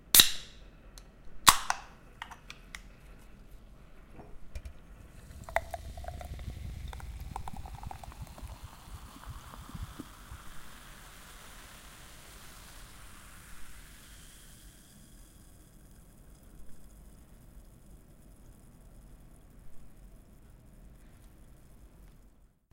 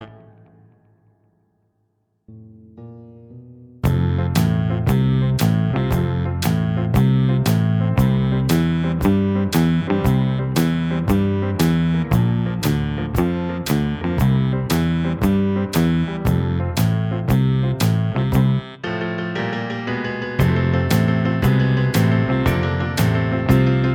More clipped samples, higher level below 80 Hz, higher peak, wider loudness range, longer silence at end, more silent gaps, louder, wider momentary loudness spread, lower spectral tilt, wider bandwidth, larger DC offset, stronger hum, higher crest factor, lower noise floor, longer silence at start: neither; second, -50 dBFS vs -34 dBFS; about the same, 0 dBFS vs -2 dBFS; first, 26 LU vs 3 LU; first, 0.25 s vs 0 s; neither; second, -30 LUFS vs -19 LUFS; first, 21 LU vs 5 LU; second, -0.5 dB/octave vs -7 dB/octave; second, 16 kHz vs over 20 kHz; neither; neither; first, 36 dB vs 18 dB; second, -60 dBFS vs -68 dBFS; about the same, 0 s vs 0 s